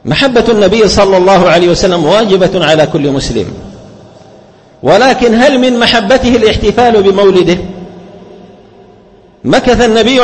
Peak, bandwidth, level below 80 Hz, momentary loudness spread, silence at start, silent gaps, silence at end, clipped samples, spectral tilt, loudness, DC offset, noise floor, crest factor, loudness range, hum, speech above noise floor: 0 dBFS; 11 kHz; -30 dBFS; 9 LU; 0.05 s; none; 0 s; 0.5%; -5 dB/octave; -7 LUFS; under 0.1%; -40 dBFS; 8 dB; 4 LU; none; 33 dB